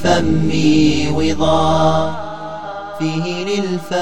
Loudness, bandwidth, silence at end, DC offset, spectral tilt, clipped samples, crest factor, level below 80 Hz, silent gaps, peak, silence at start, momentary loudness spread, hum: -16 LUFS; 10 kHz; 0 s; 6%; -6 dB/octave; under 0.1%; 16 dB; -36 dBFS; none; 0 dBFS; 0 s; 14 LU; none